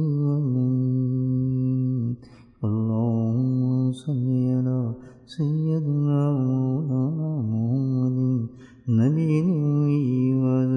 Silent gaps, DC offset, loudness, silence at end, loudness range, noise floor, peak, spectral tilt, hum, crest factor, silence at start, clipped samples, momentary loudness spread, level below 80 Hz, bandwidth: none; under 0.1%; -24 LUFS; 0 s; 2 LU; -42 dBFS; -10 dBFS; -10.5 dB/octave; none; 14 dB; 0 s; under 0.1%; 6 LU; -62 dBFS; 5 kHz